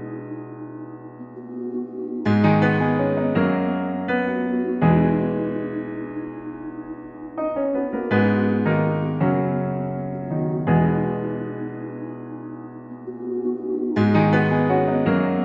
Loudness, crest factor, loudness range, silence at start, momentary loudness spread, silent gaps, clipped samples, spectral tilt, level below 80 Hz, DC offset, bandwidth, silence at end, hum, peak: -22 LUFS; 18 dB; 5 LU; 0 s; 17 LU; none; under 0.1%; -10 dB/octave; -52 dBFS; under 0.1%; 5.6 kHz; 0 s; none; -4 dBFS